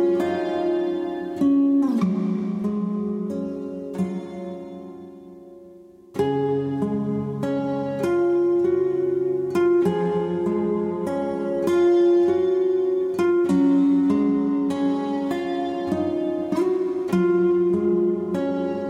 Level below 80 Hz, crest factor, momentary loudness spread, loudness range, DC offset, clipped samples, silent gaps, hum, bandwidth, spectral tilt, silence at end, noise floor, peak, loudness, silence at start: -62 dBFS; 12 dB; 10 LU; 8 LU; under 0.1%; under 0.1%; none; none; 10 kHz; -8.5 dB/octave; 0 s; -46 dBFS; -10 dBFS; -22 LUFS; 0 s